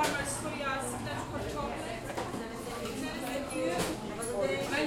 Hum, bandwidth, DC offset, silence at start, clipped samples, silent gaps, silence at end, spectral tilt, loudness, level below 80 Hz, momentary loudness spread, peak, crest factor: none; 16.5 kHz; under 0.1%; 0 s; under 0.1%; none; 0 s; -4 dB/octave; -35 LUFS; -52 dBFS; 6 LU; -16 dBFS; 18 dB